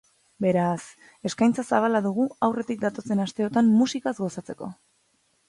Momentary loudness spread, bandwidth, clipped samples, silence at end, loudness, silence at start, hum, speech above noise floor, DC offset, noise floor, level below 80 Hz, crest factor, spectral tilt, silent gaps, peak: 15 LU; 11.5 kHz; under 0.1%; 0.75 s; -25 LUFS; 0.4 s; none; 44 dB; under 0.1%; -68 dBFS; -66 dBFS; 18 dB; -6 dB/octave; none; -6 dBFS